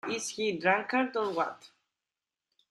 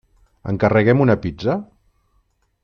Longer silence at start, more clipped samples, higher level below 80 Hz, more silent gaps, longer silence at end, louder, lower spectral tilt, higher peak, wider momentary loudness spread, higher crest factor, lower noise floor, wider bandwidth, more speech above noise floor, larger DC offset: second, 0.05 s vs 0.45 s; neither; second, -78 dBFS vs -48 dBFS; neither; about the same, 1.05 s vs 1 s; second, -30 LUFS vs -18 LUFS; second, -3.5 dB/octave vs -9 dB/octave; second, -10 dBFS vs -2 dBFS; second, 8 LU vs 13 LU; about the same, 22 dB vs 18 dB; first, under -90 dBFS vs -64 dBFS; first, 12.5 kHz vs 6.6 kHz; first, over 59 dB vs 47 dB; neither